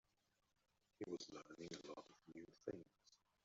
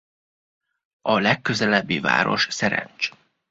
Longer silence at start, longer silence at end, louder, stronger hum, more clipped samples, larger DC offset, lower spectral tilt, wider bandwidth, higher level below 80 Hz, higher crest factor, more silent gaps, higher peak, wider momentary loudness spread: about the same, 1 s vs 1.05 s; about the same, 0.3 s vs 0.4 s; second, -56 LUFS vs -21 LUFS; neither; neither; neither; about the same, -4.5 dB/octave vs -4 dB/octave; about the same, 7.6 kHz vs 8 kHz; second, -86 dBFS vs -60 dBFS; about the same, 24 dB vs 22 dB; neither; second, -34 dBFS vs -2 dBFS; about the same, 9 LU vs 8 LU